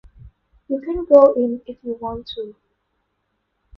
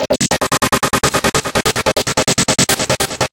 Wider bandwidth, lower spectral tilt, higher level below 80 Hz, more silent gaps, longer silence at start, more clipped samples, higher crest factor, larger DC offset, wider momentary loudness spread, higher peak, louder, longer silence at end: second, 5.4 kHz vs 17.5 kHz; first, -8.5 dB/octave vs -2.5 dB/octave; second, -48 dBFS vs -36 dBFS; neither; first, 0.25 s vs 0 s; neither; about the same, 20 dB vs 16 dB; neither; first, 19 LU vs 3 LU; about the same, 0 dBFS vs 0 dBFS; second, -17 LUFS vs -14 LUFS; first, 1.25 s vs 0.05 s